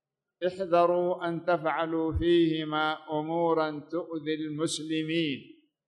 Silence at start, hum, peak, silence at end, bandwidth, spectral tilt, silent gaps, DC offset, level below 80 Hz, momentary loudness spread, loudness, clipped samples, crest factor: 0.4 s; none; -12 dBFS; 0.45 s; 11.5 kHz; -5.5 dB/octave; none; under 0.1%; -50 dBFS; 9 LU; -29 LUFS; under 0.1%; 16 dB